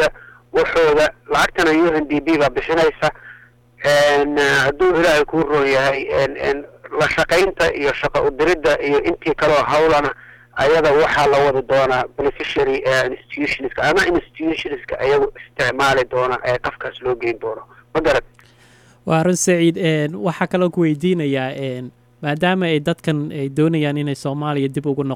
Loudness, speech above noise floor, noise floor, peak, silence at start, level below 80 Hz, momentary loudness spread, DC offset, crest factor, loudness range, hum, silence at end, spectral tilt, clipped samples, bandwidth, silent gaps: -17 LUFS; 32 dB; -49 dBFS; -4 dBFS; 0 s; -42 dBFS; 9 LU; under 0.1%; 14 dB; 4 LU; none; 0 s; -5 dB/octave; under 0.1%; 16.5 kHz; none